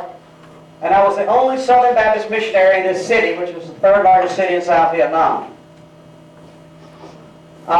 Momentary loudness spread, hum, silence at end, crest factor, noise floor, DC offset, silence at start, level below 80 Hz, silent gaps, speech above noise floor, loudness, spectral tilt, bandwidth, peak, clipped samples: 12 LU; none; 0 s; 12 dB; -42 dBFS; under 0.1%; 0 s; -52 dBFS; none; 29 dB; -14 LUFS; -4.5 dB/octave; 10 kHz; -4 dBFS; under 0.1%